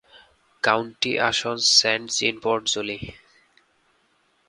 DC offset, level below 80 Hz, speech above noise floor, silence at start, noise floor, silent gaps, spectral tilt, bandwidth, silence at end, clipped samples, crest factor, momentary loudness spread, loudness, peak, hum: under 0.1%; -58 dBFS; 42 dB; 0.15 s; -65 dBFS; none; -1.5 dB/octave; 11.5 kHz; 1.35 s; under 0.1%; 22 dB; 12 LU; -21 LUFS; -2 dBFS; none